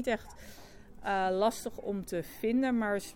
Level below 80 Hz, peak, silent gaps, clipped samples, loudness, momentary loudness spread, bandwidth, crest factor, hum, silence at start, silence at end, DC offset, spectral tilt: -56 dBFS; -16 dBFS; none; under 0.1%; -32 LUFS; 21 LU; 19 kHz; 18 dB; none; 0 s; 0 s; under 0.1%; -5 dB/octave